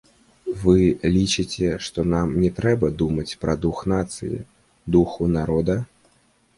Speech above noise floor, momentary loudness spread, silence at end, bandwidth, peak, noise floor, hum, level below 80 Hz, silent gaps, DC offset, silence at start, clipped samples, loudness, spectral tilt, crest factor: 40 dB; 12 LU; 0.7 s; 11.5 kHz; -4 dBFS; -61 dBFS; none; -38 dBFS; none; under 0.1%; 0.45 s; under 0.1%; -22 LUFS; -6.5 dB/octave; 18 dB